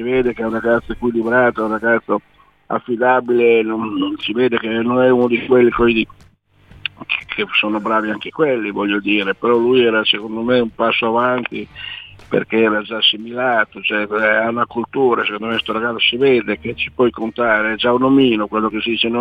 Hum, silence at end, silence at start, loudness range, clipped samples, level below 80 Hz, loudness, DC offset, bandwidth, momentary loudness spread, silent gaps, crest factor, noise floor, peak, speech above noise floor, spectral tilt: none; 0 s; 0 s; 2 LU; under 0.1%; -46 dBFS; -16 LUFS; under 0.1%; 5 kHz; 9 LU; none; 16 dB; -50 dBFS; -2 dBFS; 34 dB; -7 dB/octave